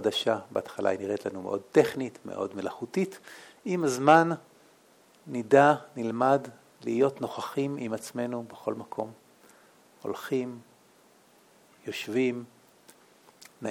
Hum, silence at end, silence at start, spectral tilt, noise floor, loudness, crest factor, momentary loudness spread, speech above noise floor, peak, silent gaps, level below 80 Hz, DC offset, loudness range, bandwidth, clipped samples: none; 0 s; 0 s; -5.5 dB/octave; -60 dBFS; -28 LUFS; 24 dB; 18 LU; 33 dB; -4 dBFS; none; -78 dBFS; under 0.1%; 11 LU; 17.5 kHz; under 0.1%